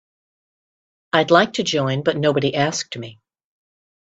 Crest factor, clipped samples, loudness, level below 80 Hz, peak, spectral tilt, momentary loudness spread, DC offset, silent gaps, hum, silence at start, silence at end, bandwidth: 22 dB; under 0.1%; -19 LUFS; -60 dBFS; 0 dBFS; -4.5 dB/octave; 14 LU; under 0.1%; none; none; 1.15 s; 1.1 s; 8.4 kHz